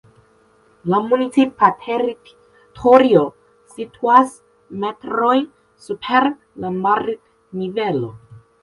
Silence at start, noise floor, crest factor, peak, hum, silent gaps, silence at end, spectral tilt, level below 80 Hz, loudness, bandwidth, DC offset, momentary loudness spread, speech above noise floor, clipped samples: 0.85 s; -55 dBFS; 18 dB; 0 dBFS; none; none; 0.25 s; -6.5 dB/octave; -58 dBFS; -17 LUFS; 11.5 kHz; under 0.1%; 18 LU; 38 dB; under 0.1%